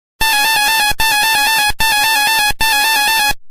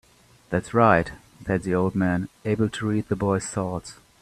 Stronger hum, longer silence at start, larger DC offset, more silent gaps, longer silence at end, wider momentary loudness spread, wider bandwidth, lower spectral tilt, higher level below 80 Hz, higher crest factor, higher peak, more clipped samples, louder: neither; second, 0.2 s vs 0.5 s; neither; neither; second, 0 s vs 0.3 s; second, 1 LU vs 13 LU; first, 16 kHz vs 13 kHz; second, 1 dB/octave vs -6.5 dB/octave; first, -32 dBFS vs -52 dBFS; second, 12 dB vs 22 dB; about the same, 0 dBFS vs -2 dBFS; neither; first, -11 LUFS vs -24 LUFS